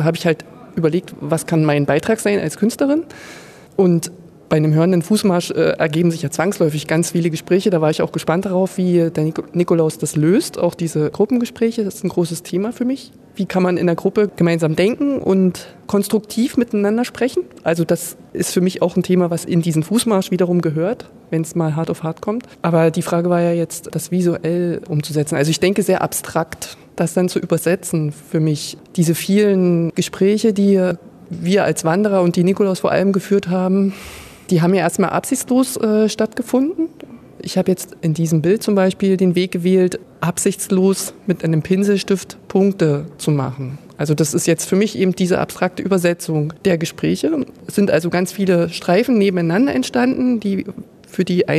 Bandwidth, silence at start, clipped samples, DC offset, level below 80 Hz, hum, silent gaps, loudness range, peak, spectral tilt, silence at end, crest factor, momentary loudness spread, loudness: 14 kHz; 0 s; under 0.1%; under 0.1%; -56 dBFS; none; none; 2 LU; -2 dBFS; -6 dB/octave; 0 s; 16 dB; 7 LU; -18 LUFS